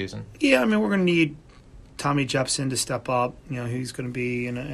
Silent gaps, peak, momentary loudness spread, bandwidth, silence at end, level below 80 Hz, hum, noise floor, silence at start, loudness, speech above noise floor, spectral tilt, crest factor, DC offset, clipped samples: none; -6 dBFS; 10 LU; 15 kHz; 0 s; -52 dBFS; none; -48 dBFS; 0 s; -24 LUFS; 23 dB; -4.5 dB/octave; 18 dB; under 0.1%; under 0.1%